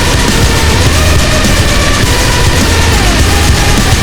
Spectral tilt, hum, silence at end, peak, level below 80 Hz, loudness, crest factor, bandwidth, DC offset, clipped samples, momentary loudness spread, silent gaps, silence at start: -4 dB/octave; none; 0 s; 0 dBFS; -12 dBFS; -8 LUFS; 8 dB; over 20 kHz; under 0.1%; 0.7%; 1 LU; none; 0 s